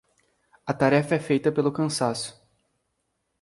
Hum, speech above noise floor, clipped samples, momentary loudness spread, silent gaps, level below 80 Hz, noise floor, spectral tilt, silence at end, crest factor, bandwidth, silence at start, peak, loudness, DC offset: none; 53 dB; under 0.1%; 12 LU; none; -64 dBFS; -76 dBFS; -5.5 dB/octave; 1.1 s; 20 dB; 11.5 kHz; 0.65 s; -6 dBFS; -24 LUFS; under 0.1%